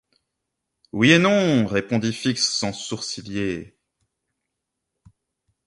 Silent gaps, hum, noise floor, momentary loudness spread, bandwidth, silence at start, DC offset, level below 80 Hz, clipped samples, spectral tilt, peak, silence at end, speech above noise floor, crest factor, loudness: none; none; -81 dBFS; 13 LU; 11.5 kHz; 0.95 s; under 0.1%; -56 dBFS; under 0.1%; -4.5 dB/octave; -2 dBFS; 2.05 s; 60 dB; 22 dB; -21 LUFS